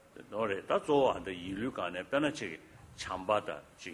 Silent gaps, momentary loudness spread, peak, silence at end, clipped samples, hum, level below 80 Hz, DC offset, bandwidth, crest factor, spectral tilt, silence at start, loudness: none; 15 LU; -16 dBFS; 0 s; under 0.1%; none; -62 dBFS; under 0.1%; 16 kHz; 20 dB; -5 dB/octave; 0.15 s; -34 LUFS